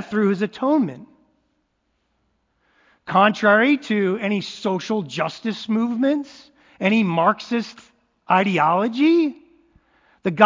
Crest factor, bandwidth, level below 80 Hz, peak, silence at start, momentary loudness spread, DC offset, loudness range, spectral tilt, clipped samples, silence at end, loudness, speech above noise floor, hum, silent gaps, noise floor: 22 dB; 7.6 kHz; -68 dBFS; 0 dBFS; 0 s; 10 LU; under 0.1%; 3 LU; -6.5 dB/octave; under 0.1%; 0 s; -20 LUFS; 51 dB; none; none; -70 dBFS